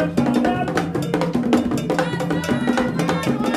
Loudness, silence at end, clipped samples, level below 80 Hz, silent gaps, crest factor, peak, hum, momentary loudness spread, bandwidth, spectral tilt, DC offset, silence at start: -20 LUFS; 0 s; under 0.1%; -46 dBFS; none; 18 dB; -2 dBFS; none; 3 LU; 15.5 kHz; -6 dB/octave; under 0.1%; 0 s